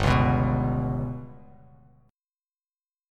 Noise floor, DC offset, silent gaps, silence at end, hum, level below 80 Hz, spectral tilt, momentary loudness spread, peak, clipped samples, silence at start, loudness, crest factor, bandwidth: under -90 dBFS; under 0.1%; none; 1.75 s; none; -38 dBFS; -7.5 dB/octave; 17 LU; -8 dBFS; under 0.1%; 0 s; -25 LUFS; 18 dB; 10 kHz